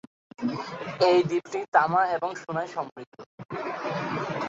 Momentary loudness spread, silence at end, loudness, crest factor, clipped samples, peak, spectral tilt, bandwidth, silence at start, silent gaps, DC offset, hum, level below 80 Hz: 17 LU; 0 s; -27 LUFS; 22 dB; under 0.1%; -6 dBFS; -6 dB/octave; 7.8 kHz; 0.4 s; 1.68-1.72 s, 2.92-2.96 s, 3.07-3.12 s, 3.26-3.38 s, 3.45-3.49 s; under 0.1%; none; -70 dBFS